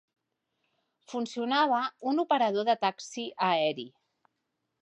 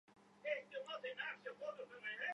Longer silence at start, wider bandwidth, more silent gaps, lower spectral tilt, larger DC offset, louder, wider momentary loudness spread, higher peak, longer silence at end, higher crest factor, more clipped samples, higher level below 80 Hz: first, 1.1 s vs 0.1 s; about the same, 10 kHz vs 10.5 kHz; neither; first, -4 dB/octave vs -2.5 dB/octave; neither; first, -29 LUFS vs -47 LUFS; first, 12 LU vs 5 LU; first, -12 dBFS vs -28 dBFS; first, 0.95 s vs 0 s; about the same, 18 dB vs 20 dB; neither; about the same, -86 dBFS vs under -90 dBFS